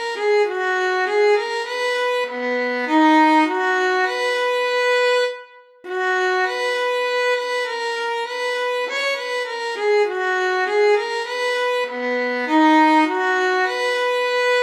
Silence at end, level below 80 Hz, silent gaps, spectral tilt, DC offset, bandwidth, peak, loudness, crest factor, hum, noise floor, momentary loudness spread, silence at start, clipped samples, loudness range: 0 s; -86 dBFS; none; -1 dB/octave; under 0.1%; 13 kHz; -6 dBFS; -19 LUFS; 14 dB; none; -42 dBFS; 8 LU; 0 s; under 0.1%; 4 LU